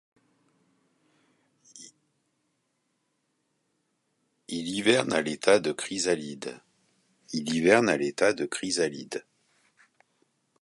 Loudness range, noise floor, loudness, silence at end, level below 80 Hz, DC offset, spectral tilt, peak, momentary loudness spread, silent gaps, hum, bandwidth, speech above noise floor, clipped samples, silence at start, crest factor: 5 LU; -76 dBFS; -26 LUFS; 1.4 s; -70 dBFS; under 0.1%; -3.5 dB/octave; -6 dBFS; 17 LU; none; none; 11.5 kHz; 50 dB; under 0.1%; 1.75 s; 24 dB